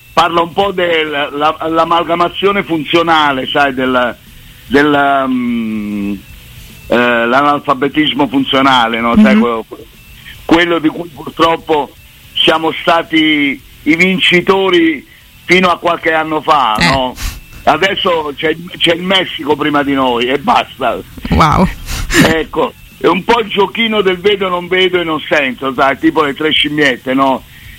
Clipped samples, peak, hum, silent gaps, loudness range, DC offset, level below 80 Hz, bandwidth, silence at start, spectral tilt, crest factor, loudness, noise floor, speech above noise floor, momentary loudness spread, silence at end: under 0.1%; 0 dBFS; none; none; 3 LU; under 0.1%; -34 dBFS; 16.5 kHz; 0.15 s; -5 dB/octave; 12 dB; -12 LUFS; -34 dBFS; 22 dB; 8 LU; 0 s